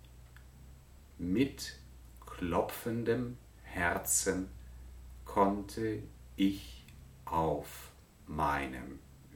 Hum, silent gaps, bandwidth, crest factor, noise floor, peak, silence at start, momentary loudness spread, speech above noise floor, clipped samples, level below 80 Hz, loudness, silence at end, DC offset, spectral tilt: none; none; 19 kHz; 20 dB; -55 dBFS; -16 dBFS; 0.05 s; 22 LU; 22 dB; under 0.1%; -52 dBFS; -35 LUFS; 0 s; under 0.1%; -4.5 dB/octave